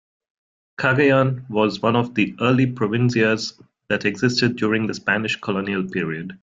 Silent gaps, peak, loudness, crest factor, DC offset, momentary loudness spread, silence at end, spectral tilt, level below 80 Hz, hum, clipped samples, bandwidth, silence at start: none; -4 dBFS; -20 LUFS; 18 dB; under 0.1%; 8 LU; 0.05 s; -6 dB/octave; -58 dBFS; none; under 0.1%; 7.8 kHz; 0.8 s